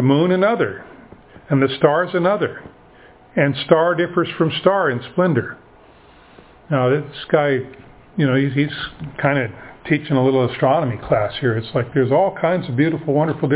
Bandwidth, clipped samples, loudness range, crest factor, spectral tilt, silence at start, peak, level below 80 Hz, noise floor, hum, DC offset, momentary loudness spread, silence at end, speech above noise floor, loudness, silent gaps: 4 kHz; under 0.1%; 2 LU; 18 dB; -11 dB/octave; 0 s; 0 dBFS; -52 dBFS; -47 dBFS; none; under 0.1%; 8 LU; 0 s; 29 dB; -18 LUFS; none